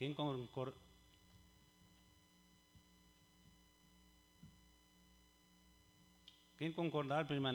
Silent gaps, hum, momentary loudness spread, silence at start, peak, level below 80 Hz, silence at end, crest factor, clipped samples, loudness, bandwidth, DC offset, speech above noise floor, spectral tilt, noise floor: none; none; 29 LU; 0 s; -26 dBFS; -76 dBFS; 0 s; 22 dB; under 0.1%; -43 LUFS; over 20 kHz; under 0.1%; 29 dB; -6.5 dB/octave; -71 dBFS